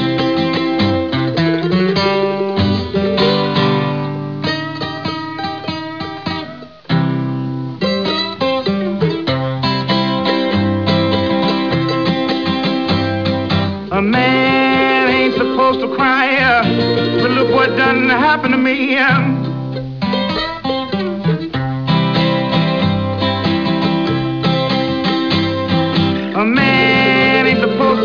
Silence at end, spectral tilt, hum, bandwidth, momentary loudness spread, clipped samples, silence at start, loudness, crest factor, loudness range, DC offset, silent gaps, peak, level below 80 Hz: 0 s; -7 dB/octave; none; 5.4 kHz; 9 LU; under 0.1%; 0 s; -15 LUFS; 10 dB; 6 LU; 0.4%; none; -6 dBFS; -46 dBFS